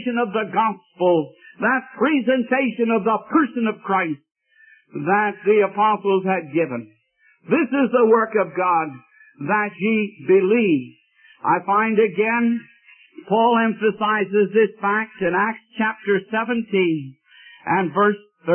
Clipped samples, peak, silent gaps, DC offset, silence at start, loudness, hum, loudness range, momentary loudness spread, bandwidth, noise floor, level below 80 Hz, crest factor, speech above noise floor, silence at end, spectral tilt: under 0.1%; -4 dBFS; none; under 0.1%; 0 s; -20 LUFS; none; 2 LU; 7 LU; 3.3 kHz; -60 dBFS; -70 dBFS; 16 dB; 40 dB; 0 s; -11 dB/octave